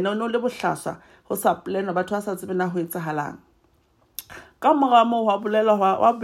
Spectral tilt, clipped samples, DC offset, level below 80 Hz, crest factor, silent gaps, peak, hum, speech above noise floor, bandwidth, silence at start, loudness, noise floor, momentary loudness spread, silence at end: -5.5 dB/octave; under 0.1%; under 0.1%; -64 dBFS; 18 dB; none; -4 dBFS; none; 40 dB; 16 kHz; 0 s; -22 LUFS; -62 dBFS; 19 LU; 0 s